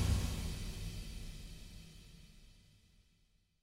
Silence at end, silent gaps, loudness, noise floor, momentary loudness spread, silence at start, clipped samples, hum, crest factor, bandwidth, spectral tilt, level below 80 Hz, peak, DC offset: 1.05 s; none; -44 LUFS; -74 dBFS; 23 LU; 0 s; under 0.1%; none; 20 dB; 16 kHz; -5 dB/octave; -46 dBFS; -22 dBFS; under 0.1%